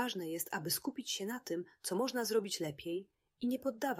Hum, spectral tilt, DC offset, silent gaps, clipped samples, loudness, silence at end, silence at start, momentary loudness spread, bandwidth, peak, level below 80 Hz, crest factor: none; -3.5 dB/octave; under 0.1%; none; under 0.1%; -38 LUFS; 0 s; 0 s; 7 LU; 16 kHz; -22 dBFS; -78 dBFS; 16 dB